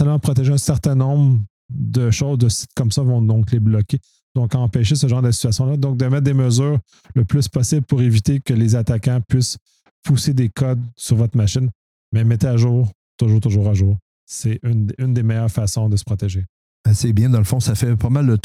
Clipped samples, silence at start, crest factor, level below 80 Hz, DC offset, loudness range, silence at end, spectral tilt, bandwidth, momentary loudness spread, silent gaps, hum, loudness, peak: under 0.1%; 0 s; 12 dB; -42 dBFS; under 0.1%; 2 LU; 0.05 s; -6.5 dB/octave; 14.5 kHz; 7 LU; 1.50-1.69 s, 4.23-4.35 s, 9.61-9.66 s, 9.91-10.03 s, 11.75-12.12 s, 12.95-13.18 s, 14.02-14.27 s, 16.49-16.84 s; none; -18 LUFS; -4 dBFS